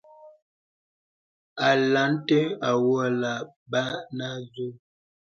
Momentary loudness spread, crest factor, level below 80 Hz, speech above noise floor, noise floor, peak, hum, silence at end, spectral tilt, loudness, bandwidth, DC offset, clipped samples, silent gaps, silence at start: 14 LU; 18 dB; -72 dBFS; over 65 dB; under -90 dBFS; -8 dBFS; none; 0.45 s; -5.5 dB/octave; -25 LUFS; 7.4 kHz; under 0.1%; under 0.1%; 0.42-1.56 s, 3.56-3.66 s; 0.25 s